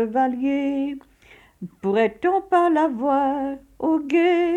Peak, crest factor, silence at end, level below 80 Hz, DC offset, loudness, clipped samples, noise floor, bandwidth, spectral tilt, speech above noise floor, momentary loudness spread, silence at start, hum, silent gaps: -6 dBFS; 16 dB; 0 s; -58 dBFS; under 0.1%; -22 LUFS; under 0.1%; -52 dBFS; 9.2 kHz; -7 dB/octave; 31 dB; 11 LU; 0 s; none; none